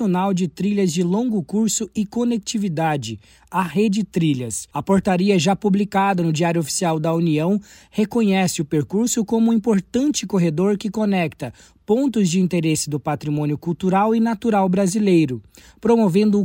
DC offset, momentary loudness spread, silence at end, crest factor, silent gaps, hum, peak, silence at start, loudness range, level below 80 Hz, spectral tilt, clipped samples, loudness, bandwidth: under 0.1%; 7 LU; 0 s; 14 dB; none; none; -6 dBFS; 0 s; 2 LU; -54 dBFS; -5.5 dB/octave; under 0.1%; -20 LUFS; 16.5 kHz